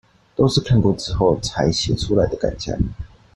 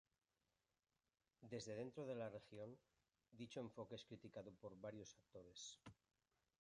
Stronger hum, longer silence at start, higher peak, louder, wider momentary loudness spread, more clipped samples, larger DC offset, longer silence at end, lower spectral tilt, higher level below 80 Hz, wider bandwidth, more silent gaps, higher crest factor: neither; second, 0.4 s vs 1.4 s; first, -2 dBFS vs -38 dBFS; first, -20 LUFS vs -56 LUFS; second, 8 LU vs 11 LU; neither; neither; second, 0.3 s vs 0.7 s; about the same, -6 dB/octave vs -5 dB/octave; first, -34 dBFS vs -86 dBFS; about the same, 11.5 kHz vs 11 kHz; neither; about the same, 16 dB vs 20 dB